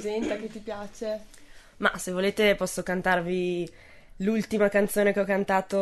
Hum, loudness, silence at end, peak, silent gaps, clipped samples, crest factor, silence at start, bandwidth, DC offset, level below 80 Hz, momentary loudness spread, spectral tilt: none; -26 LUFS; 0 s; -10 dBFS; none; under 0.1%; 18 dB; 0 s; 12.5 kHz; under 0.1%; -52 dBFS; 12 LU; -5 dB/octave